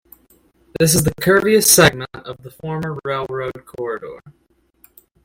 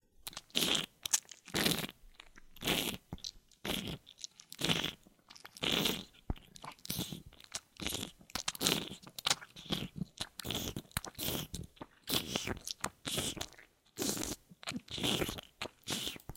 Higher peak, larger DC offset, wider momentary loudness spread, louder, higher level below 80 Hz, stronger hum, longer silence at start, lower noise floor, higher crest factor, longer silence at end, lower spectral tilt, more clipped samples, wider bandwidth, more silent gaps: first, 0 dBFS vs -6 dBFS; neither; first, 22 LU vs 15 LU; first, -16 LUFS vs -37 LUFS; first, -46 dBFS vs -56 dBFS; neither; first, 0.8 s vs 0.25 s; second, -56 dBFS vs -61 dBFS; second, 20 dB vs 34 dB; first, 0.95 s vs 0 s; about the same, -3.5 dB/octave vs -2.5 dB/octave; neither; about the same, 17 kHz vs 17 kHz; neither